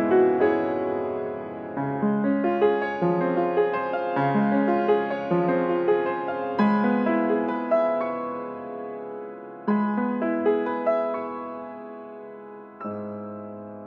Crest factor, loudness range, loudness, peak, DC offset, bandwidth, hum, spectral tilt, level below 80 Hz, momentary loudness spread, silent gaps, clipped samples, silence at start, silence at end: 16 dB; 4 LU; -25 LUFS; -8 dBFS; under 0.1%; 5.4 kHz; none; -9.5 dB/octave; -70 dBFS; 15 LU; none; under 0.1%; 0 s; 0 s